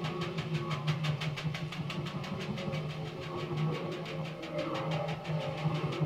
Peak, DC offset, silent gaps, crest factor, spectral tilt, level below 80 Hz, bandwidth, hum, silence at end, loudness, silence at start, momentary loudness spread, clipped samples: -20 dBFS; under 0.1%; none; 16 dB; -6.5 dB/octave; -62 dBFS; 11 kHz; none; 0 s; -36 LUFS; 0 s; 5 LU; under 0.1%